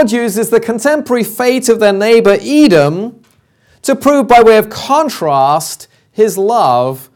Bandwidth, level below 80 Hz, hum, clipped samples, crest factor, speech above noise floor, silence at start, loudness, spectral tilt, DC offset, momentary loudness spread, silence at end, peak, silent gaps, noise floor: 18 kHz; -46 dBFS; none; under 0.1%; 10 dB; 42 dB; 0 s; -10 LUFS; -4.5 dB/octave; under 0.1%; 9 LU; 0.1 s; 0 dBFS; none; -52 dBFS